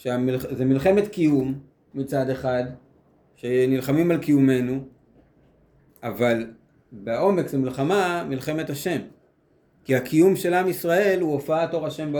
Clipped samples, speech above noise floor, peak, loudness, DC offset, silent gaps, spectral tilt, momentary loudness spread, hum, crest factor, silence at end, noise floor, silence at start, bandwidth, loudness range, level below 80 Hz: under 0.1%; 40 dB; -6 dBFS; -23 LUFS; under 0.1%; none; -6.5 dB/octave; 13 LU; none; 18 dB; 0 s; -62 dBFS; 0.05 s; over 20 kHz; 3 LU; -58 dBFS